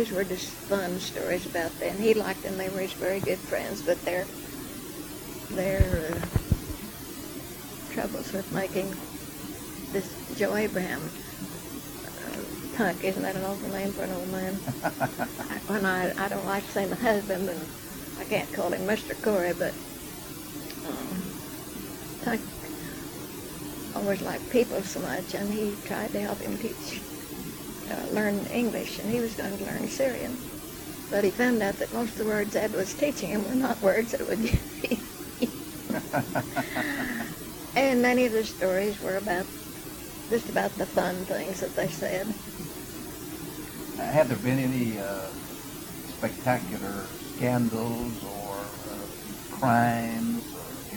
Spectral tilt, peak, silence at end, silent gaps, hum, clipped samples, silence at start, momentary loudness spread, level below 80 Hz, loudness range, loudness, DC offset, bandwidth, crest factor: -5 dB/octave; -6 dBFS; 0 s; none; none; under 0.1%; 0 s; 12 LU; -46 dBFS; 5 LU; -30 LUFS; under 0.1%; 19 kHz; 22 dB